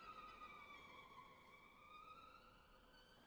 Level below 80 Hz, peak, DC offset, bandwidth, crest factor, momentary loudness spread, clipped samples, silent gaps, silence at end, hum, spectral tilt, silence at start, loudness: -78 dBFS; -48 dBFS; under 0.1%; over 20 kHz; 16 dB; 10 LU; under 0.1%; none; 0 s; none; -3.5 dB/octave; 0 s; -62 LUFS